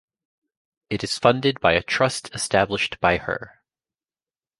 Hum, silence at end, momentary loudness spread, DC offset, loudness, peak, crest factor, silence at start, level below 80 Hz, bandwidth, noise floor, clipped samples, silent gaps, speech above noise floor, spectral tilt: none; 1.1 s; 10 LU; under 0.1%; -22 LUFS; -2 dBFS; 22 dB; 0.9 s; -50 dBFS; 11.5 kHz; under -90 dBFS; under 0.1%; none; over 68 dB; -4 dB/octave